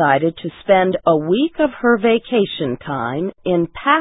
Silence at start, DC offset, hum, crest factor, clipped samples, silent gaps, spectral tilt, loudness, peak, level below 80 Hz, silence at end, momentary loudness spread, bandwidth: 0 s; under 0.1%; none; 16 dB; under 0.1%; none; -10.5 dB/octave; -17 LUFS; 0 dBFS; -52 dBFS; 0 s; 8 LU; 4 kHz